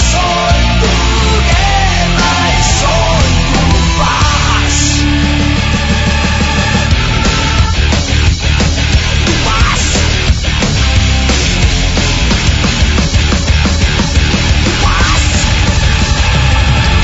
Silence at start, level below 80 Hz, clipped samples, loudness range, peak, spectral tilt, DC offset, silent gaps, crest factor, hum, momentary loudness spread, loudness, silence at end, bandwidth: 0 s; -14 dBFS; under 0.1%; 1 LU; 0 dBFS; -4 dB/octave; under 0.1%; none; 10 dB; none; 2 LU; -10 LUFS; 0 s; 8 kHz